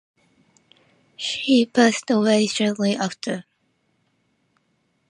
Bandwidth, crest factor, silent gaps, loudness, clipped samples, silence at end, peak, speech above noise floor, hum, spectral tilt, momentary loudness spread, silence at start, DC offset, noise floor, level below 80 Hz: 11 kHz; 20 dB; none; -21 LUFS; under 0.1%; 1.7 s; -4 dBFS; 49 dB; none; -4 dB/octave; 12 LU; 1.2 s; under 0.1%; -68 dBFS; -72 dBFS